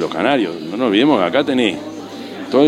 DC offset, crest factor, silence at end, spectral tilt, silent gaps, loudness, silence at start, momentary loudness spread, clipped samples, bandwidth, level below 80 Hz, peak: under 0.1%; 16 dB; 0 s; -5.5 dB/octave; none; -16 LUFS; 0 s; 16 LU; under 0.1%; 12 kHz; -60 dBFS; 0 dBFS